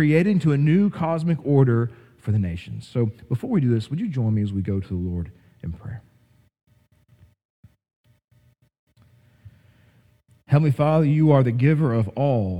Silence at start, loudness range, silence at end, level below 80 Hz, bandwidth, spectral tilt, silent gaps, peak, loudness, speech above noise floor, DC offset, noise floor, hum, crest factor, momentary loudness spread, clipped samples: 0 s; 15 LU; 0 s; -52 dBFS; 8.8 kHz; -9.5 dB/octave; 7.45-7.63 s, 7.96-8.04 s, 8.24-8.28 s, 8.79-8.87 s; -4 dBFS; -21 LUFS; 39 dB; under 0.1%; -59 dBFS; none; 18 dB; 16 LU; under 0.1%